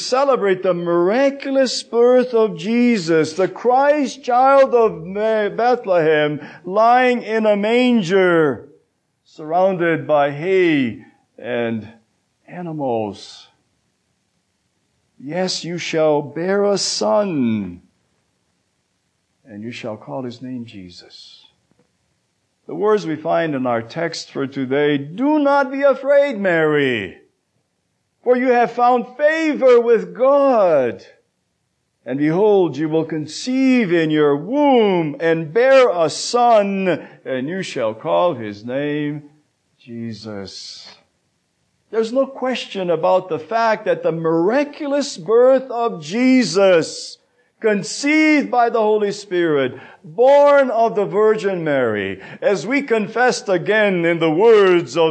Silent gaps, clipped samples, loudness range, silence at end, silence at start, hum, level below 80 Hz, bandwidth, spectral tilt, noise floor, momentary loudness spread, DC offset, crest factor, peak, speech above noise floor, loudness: none; under 0.1%; 12 LU; 0 s; 0 s; none; -70 dBFS; 9.4 kHz; -5 dB/octave; -69 dBFS; 15 LU; under 0.1%; 14 dB; -4 dBFS; 53 dB; -17 LUFS